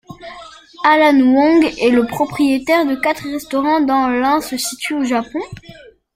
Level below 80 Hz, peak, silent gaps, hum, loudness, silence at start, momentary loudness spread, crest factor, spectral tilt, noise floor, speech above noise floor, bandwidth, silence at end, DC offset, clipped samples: -50 dBFS; -2 dBFS; none; none; -15 LUFS; 0.1 s; 15 LU; 14 dB; -4 dB/octave; -41 dBFS; 26 dB; 16 kHz; 0.4 s; under 0.1%; under 0.1%